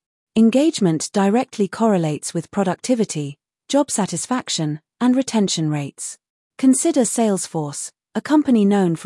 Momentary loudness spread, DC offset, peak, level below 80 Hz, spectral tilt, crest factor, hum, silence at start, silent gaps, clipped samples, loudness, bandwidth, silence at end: 12 LU; under 0.1%; -4 dBFS; -66 dBFS; -5 dB/octave; 14 dB; none; 0.35 s; 6.30-6.50 s; under 0.1%; -19 LUFS; 12 kHz; 0 s